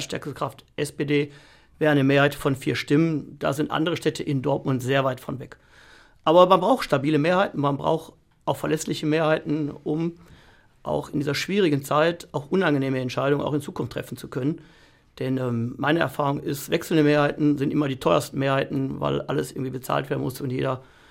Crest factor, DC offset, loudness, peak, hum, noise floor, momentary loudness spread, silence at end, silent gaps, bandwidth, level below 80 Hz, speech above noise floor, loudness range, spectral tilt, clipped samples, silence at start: 22 dB; under 0.1%; -24 LUFS; -2 dBFS; none; -54 dBFS; 11 LU; 0.3 s; none; 16 kHz; -56 dBFS; 30 dB; 5 LU; -6 dB/octave; under 0.1%; 0 s